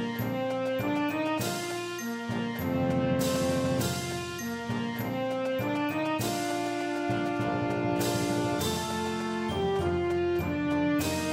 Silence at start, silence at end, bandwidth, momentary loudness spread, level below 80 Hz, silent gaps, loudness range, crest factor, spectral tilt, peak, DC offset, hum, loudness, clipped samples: 0 s; 0 s; 16 kHz; 5 LU; -54 dBFS; none; 2 LU; 14 dB; -5 dB/octave; -14 dBFS; under 0.1%; none; -30 LUFS; under 0.1%